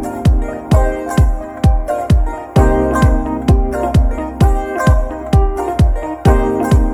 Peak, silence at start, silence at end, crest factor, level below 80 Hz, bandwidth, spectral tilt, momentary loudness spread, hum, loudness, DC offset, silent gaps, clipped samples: 0 dBFS; 0 s; 0 s; 12 dB; -16 dBFS; 14 kHz; -7.5 dB/octave; 4 LU; none; -15 LUFS; under 0.1%; none; under 0.1%